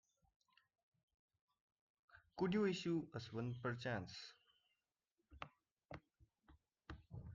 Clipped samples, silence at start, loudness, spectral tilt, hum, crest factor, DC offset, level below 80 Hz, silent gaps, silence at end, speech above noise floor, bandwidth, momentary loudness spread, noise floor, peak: under 0.1%; 2.15 s; -44 LUFS; -6.5 dB/octave; none; 20 dB; under 0.1%; -72 dBFS; 5.13-5.17 s, 5.71-5.76 s; 0 s; over 47 dB; 7.6 kHz; 20 LU; under -90 dBFS; -28 dBFS